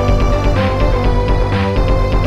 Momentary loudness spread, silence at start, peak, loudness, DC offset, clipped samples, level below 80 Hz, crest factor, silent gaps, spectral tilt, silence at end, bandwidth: 1 LU; 0 s; -4 dBFS; -15 LUFS; 3%; under 0.1%; -16 dBFS; 10 dB; none; -7.5 dB/octave; 0 s; 7.6 kHz